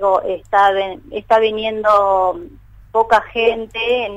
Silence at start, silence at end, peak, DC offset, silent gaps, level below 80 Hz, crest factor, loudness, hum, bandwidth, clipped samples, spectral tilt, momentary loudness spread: 0 s; 0 s; -2 dBFS; under 0.1%; none; -46 dBFS; 14 dB; -16 LUFS; none; 10.5 kHz; under 0.1%; -4.5 dB/octave; 8 LU